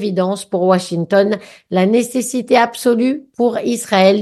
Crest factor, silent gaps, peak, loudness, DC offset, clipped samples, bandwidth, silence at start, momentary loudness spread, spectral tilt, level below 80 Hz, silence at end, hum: 14 dB; none; 0 dBFS; -16 LUFS; under 0.1%; under 0.1%; 12.5 kHz; 0 s; 6 LU; -5 dB/octave; -64 dBFS; 0 s; none